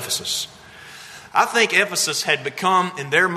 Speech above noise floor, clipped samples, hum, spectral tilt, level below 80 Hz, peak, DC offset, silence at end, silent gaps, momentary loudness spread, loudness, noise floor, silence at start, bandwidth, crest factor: 21 dB; under 0.1%; none; -1.5 dB/octave; -64 dBFS; -2 dBFS; under 0.1%; 0 s; none; 21 LU; -19 LUFS; -41 dBFS; 0 s; 13.5 kHz; 20 dB